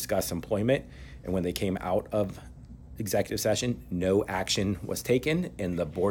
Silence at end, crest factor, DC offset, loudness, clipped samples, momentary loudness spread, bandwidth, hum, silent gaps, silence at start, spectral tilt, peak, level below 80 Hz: 0 s; 18 dB; under 0.1%; -29 LUFS; under 0.1%; 12 LU; 17.5 kHz; none; none; 0 s; -5 dB/octave; -12 dBFS; -50 dBFS